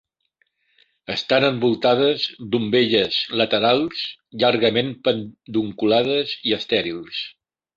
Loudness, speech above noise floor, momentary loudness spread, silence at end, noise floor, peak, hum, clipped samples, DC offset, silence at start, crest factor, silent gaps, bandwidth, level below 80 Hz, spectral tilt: -20 LUFS; 48 dB; 11 LU; 0.45 s; -69 dBFS; -2 dBFS; none; under 0.1%; under 0.1%; 1.1 s; 20 dB; none; 7.6 kHz; -60 dBFS; -6 dB/octave